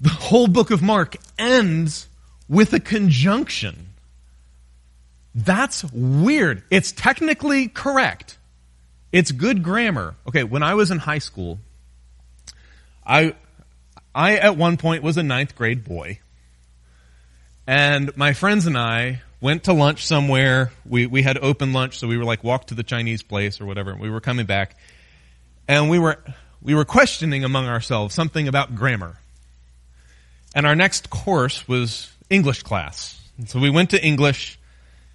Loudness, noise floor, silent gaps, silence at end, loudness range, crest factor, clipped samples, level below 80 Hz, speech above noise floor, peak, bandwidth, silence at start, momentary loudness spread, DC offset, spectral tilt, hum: -19 LUFS; -52 dBFS; none; 0.6 s; 5 LU; 20 dB; under 0.1%; -48 dBFS; 33 dB; 0 dBFS; 11.5 kHz; 0 s; 13 LU; under 0.1%; -5.5 dB/octave; 60 Hz at -45 dBFS